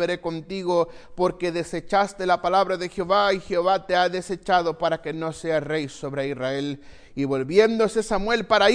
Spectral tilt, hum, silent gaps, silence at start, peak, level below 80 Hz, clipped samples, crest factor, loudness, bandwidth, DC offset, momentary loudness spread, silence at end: -5 dB/octave; none; none; 0 s; -4 dBFS; -48 dBFS; under 0.1%; 18 dB; -24 LUFS; 10.5 kHz; under 0.1%; 9 LU; 0 s